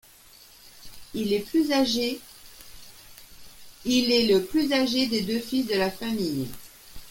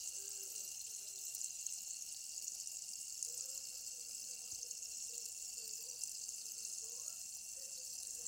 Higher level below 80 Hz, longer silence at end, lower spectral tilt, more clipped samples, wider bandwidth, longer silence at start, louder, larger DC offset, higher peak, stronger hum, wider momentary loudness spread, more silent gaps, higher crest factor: first, -54 dBFS vs -82 dBFS; about the same, 0 s vs 0 s; first, -4 dB/octave vs 2.5 dB/octave; neither; about the same, 17 kHz vs 17 kHz; first, 0.65 s vs 0 s; first, -25 LUFS vs -44 LUFS; neither; first, -10 dBFS vs -24 dBFS; neither; first, 25 LU vs 3 LU; neither; second, 18 dB vs 24 dB